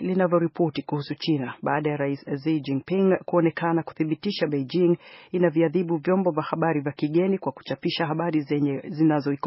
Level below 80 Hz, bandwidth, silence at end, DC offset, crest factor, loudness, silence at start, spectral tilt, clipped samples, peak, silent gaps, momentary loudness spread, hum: -70 dBFS; 5.8 kHz; 0 s; under 0.1%; 16 dB; -25 LUFS; 0 s; -6 dB/octave; under 0.1%; -8 dBFS; none; 6 LU; none